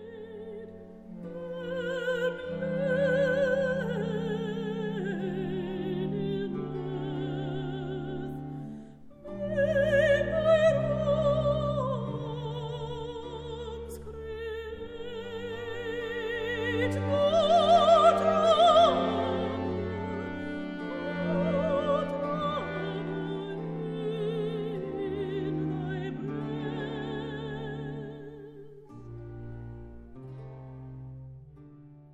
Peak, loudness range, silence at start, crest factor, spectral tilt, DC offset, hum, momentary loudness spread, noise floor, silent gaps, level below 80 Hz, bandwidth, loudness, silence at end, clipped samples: -10 dBFS; 15 LU; 0 s; 20 dB; -6.5 dB/octave; under 0.1%; none; 21 LU; -51 dBFS; none; -52 dBFS; 12.5 kHz; -29 LUFS; 0 s; under 0.1%